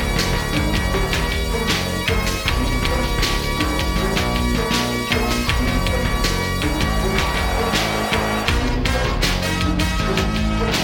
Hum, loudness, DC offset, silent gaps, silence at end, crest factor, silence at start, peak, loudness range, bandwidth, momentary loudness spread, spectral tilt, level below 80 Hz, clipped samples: none; -20 LUFS; under 0.1%; none; 0 s; 18 dB; 0 s; -2 dBFS; 1 LU; over 20 kHz; 1 LU; -4.5 dB/octave; -24 dBFS; under 0.1%